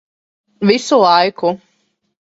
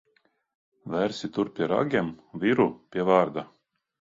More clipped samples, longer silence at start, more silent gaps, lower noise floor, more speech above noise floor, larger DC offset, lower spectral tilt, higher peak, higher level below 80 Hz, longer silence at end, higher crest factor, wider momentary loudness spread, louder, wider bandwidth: neither; second, 0.6 s vs 0.85 s; neither; second, -64 dBFS vs -69 dBFS; first, 52 dB vs 43 dB; neither; second, -4.5 dB/octave vs -7 dB/octave; first, 0 dBFS vs -6 dBFS; about the same, -60 dBFS vs -64 dBFS; about the same, 0.7 s vs 0.7 s; about the same, 16 dB vs 20 dB; second, 9 LU vs 12 LU; first, -14 LUFS vs -26 LUFS; about the same, 8 kHz vs 7.8 kHz